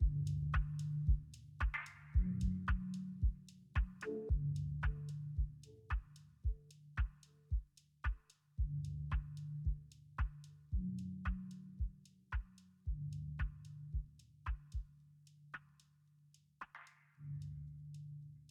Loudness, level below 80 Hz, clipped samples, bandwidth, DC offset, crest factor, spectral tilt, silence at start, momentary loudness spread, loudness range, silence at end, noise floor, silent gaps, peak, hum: -44 LUFS; -44 dBFS; under 0.1%; 9.2 kHz; under 0.1%; 18 dB; -7.5 dB/octave; 0 s; 16 LU; 12 LU; 0.05 s; -70 dBFS; none; -24 dBFS; none